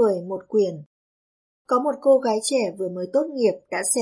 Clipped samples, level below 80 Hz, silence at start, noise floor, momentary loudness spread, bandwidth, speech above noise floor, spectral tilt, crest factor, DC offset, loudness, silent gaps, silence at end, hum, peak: under 0.1%; -78 dBFS; 0 s; under -90 dBFS; 8 LU; 11.5 kHz; over 68 dB; -4 dB/octave; 16 dB; under 0.1%; -23 LUFS; 0.86-1.65 s; 0 s; none; -6 dBFS